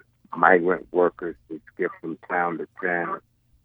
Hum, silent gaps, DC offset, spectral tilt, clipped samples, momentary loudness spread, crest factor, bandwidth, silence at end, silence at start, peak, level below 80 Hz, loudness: none; none; under 0.1%; -9 dB/octave; under 0.1%; 18 LU; 24 dB; 3.8 kHz; 0.45 s; 0.3 s; 0 dBFS; -64 dBFS; -24 LUFS